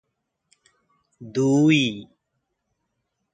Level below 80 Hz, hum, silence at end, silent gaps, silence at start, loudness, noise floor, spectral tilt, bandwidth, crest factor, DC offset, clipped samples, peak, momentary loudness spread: -66 dBFS; none; 1.3 s; none; 1.2 s; -20 LUFS; -77 dBFS; -5.5 dB/octave; 9.4 kHz; 20 dB; under 0.1%; under 0.1%; -6 dBFS; 15 LU